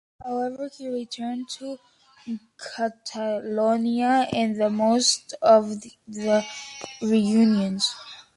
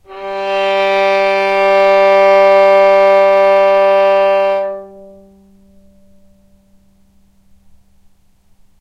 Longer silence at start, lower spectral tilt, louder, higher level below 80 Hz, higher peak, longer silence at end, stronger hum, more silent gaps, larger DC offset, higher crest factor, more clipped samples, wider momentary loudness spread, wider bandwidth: about the same, 0.2 s vs 0.1 s; about the same, -4 dB/octave vs -4 dB/octave; second, -23 LUFS vs -10 LUFS; second, -66 dBFS vs -54 dBFS; second, -6 dBFS vs 0 dBFS; second, 0.15 s vs 3.95 s; neither; neither; neither; first, 18 dB vs 12 dB; neither; first, 17 LU vs 10 LU; first, 11.5 kHz vs 7.8 kHz